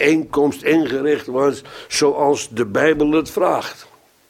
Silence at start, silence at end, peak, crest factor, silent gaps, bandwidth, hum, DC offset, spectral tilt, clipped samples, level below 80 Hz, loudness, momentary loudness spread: 0 s; 0.45 s; 0 dBFS; 18 dB; none; 16 kHz; none; under 0.1%; -4.5 dB/octave; under 0.1%; -50 dBFS; -18 LUFS; 6 LU